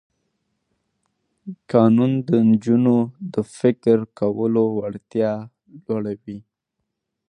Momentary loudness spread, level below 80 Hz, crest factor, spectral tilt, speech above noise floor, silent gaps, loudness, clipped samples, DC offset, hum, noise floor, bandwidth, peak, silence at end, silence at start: 17 LU; -62 dBFS; 18 dB; -9 dB/octave; 60 dB; none; -20 LUFS; under 0.1%; under 0.1%; none; -79 dBFS; 10 kHz; -2 dBFS; 0.9 s; 1.45 s